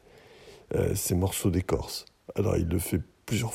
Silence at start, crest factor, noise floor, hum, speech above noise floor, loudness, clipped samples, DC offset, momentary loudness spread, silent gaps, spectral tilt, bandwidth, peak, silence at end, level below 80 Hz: 0.15 s; 16 dB; -53 dBFS; none; 25 dB; -29 LUFS; under 0.1%; under 0.1%; 7 LU; none; -5.5 dB/octave; 16 kHz; -12 dBFS; 0 s; -46 dBFS